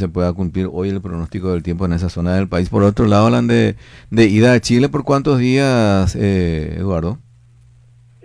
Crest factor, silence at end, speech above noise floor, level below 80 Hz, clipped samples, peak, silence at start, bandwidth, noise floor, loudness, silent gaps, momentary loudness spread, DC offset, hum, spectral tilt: 14 dB; 1.1 s; 32 dB; -34 dBFS; under 0.1%; -2 dBFS; 0 s; 11 kHz; -47 dBFS; -16 LUFS; none; 9 LU; under 0.1%; none; -7 dB/octave